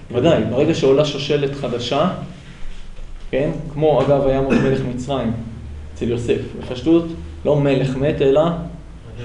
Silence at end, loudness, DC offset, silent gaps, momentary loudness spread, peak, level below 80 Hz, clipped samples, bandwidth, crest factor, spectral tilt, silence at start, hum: 0 s; -18 LUFS; under 0.1%; none; 17 LU; -2 dBFS; -36 dBFS; under 0.1%; 10.5 kHz; 16 dB; -7 dB/octave; 0 s; none